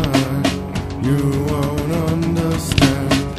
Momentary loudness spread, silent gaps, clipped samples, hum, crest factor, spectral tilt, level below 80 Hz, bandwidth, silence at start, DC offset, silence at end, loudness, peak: 5 LU; none; under 0.1%; none; 18 dB; -5.5 dB/octave; -32 dBFS; 15 kHz; 0 s; 0.2%; 0 s; -18 LUFS; 0 dBFS